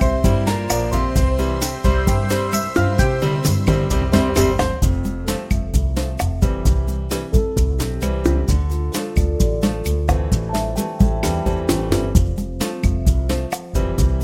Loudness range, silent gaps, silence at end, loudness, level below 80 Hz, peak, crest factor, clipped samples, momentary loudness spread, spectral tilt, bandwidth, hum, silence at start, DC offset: 2 LU; none; 0 s; -20 LUFS; -20 dBFS; 0 dBFS; 16 dB; under 0.1%; 5 LU; -6 dB/octave; 17 kHz; none; 0 s; under 0.1%